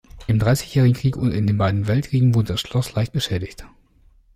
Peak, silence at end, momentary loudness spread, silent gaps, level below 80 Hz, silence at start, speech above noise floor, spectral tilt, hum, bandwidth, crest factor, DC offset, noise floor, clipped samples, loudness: -6 dBFS; 0.7 s; 6 LU; none; -42 dBFS; 0.15 s; 35 dB; -6.5 dB/octave; none; 15.5 kHz; 14 dB; under 0.1%; -54 dBFS; under 0.1%; -20 LUFS